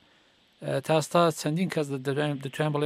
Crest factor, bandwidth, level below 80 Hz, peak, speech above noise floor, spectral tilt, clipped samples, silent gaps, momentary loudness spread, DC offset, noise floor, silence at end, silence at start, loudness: 20 dB; 15.5 kHz; -74 dBFS; -8 dBFS; 36 dB; -5.5 dB/octave; under 0.1%; none; 8 LU; under 0.1%; -62 dBFS; 0 s; 0.6 s; -27 LUFS